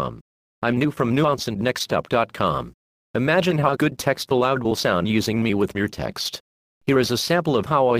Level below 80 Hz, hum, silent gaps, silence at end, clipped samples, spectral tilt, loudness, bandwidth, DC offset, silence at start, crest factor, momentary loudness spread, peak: -50 dBFS; none; 0.21-0.62 s, 2.74-3.14 s, 6.40-6.81 s; 0 s; under 0.1%; -5.5 dB/octave; -22 LUFS; 15.5 kHz; under 0.1%; 0 s; 18 dB; 8 LU; -4 dBFS